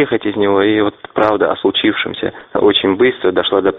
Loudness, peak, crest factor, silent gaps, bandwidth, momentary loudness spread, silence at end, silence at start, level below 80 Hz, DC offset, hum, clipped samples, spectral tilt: -14 LUFS; 0 dBFS; 14 dB; none; 4.5 kHz; 6 LU; 0 s; 0 s; -50 dBFS; under 0.1%; none; under 0.1%; -2.5 dB/octave